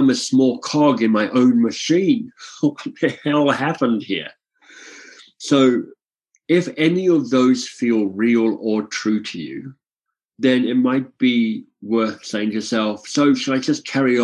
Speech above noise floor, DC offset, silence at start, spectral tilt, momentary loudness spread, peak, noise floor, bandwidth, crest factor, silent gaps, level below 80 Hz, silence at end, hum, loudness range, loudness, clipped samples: 65 dB; under 0.1%; 0 s; -5 dB/octave; 10 LU; -2 dBFS; -83 dBFS; 10.5 kHz; 16 dB; 10.25-10.29 s; -68 dBFS; 0 s; none; 3 LU; -19 LUFS; under 0.1%